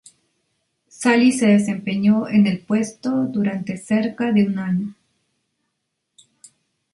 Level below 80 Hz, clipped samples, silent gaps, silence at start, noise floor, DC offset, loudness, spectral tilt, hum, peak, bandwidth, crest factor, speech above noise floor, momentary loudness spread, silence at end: -62 dBFS; under 0.1%; none; 1 s; -76 dBFS; under 0.1%; -19 LUFS; -6 dB/octave; none; -4 dBFS; 11.5 kHz; 16 dB; 58 dB; 8 LU; 2 s